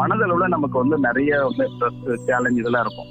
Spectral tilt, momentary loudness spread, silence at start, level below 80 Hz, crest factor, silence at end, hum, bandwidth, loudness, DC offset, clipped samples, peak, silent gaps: -7.5 dB/octave; 4 LU; 0 s; -52 dBFS; 14 dB; 0 s; none; 9 kHz; -20 LUFS; under 0.1%; under 0.1%; -6 dBFS; none